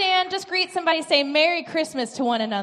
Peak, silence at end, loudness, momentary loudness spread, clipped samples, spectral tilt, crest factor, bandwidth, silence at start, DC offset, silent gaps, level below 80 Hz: -4 dBFS; 0 s; -22 LUFS; 6 LU; under 0.1%; -2.5 dB/octave; 18 dB; 13 kHz; 0 s; under 0.1%; none; -74 dBFS